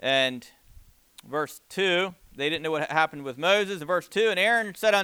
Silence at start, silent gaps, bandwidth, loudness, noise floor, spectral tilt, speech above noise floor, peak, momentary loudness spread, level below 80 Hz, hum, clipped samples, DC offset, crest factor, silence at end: 0 s; none; over 20 kHz; -25 LUFS; -53 dBFS; -3.5 dB/octave; 28 dB; -6 dBFS; 9 LU; -62 dBFS; none; under 0.1%; under 0.1%; 20 dB; 0 s